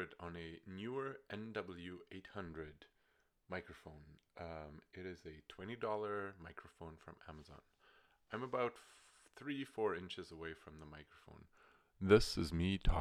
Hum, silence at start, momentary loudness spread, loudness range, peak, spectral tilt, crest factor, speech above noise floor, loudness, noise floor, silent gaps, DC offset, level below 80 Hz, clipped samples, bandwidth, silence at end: none; 0 s; 20 LU; 12 LU; -16 dBFS; -6 dB/octave; 26 dB; 36 dB; -42 LUFS; -79 dBFS; none; under 0.1%; -52 dBFS; under 0.1%; 14 kHz; 0 s